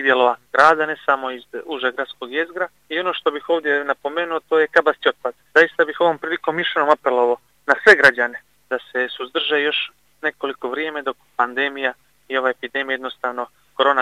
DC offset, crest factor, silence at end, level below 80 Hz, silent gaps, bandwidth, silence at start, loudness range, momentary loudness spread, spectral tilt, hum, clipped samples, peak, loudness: under 0.1%; 20 dB; 0 s; -66 dBFS; none; 12.5 kHz; 0 s; 7 LU; 13 LU; -3.5 dB/octave; none; under 0.1%; 0 dBFS; -19 LUFS